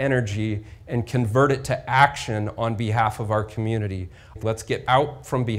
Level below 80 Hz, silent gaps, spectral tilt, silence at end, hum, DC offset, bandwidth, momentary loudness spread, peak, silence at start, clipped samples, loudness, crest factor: -46 dBFS; none; -6 dB/octave; 0 s; none; under 0.1%; 15 kHz; 10 LU; -2 dBFS; 0 s; under 0.1%; -23 LUFS; 20 dB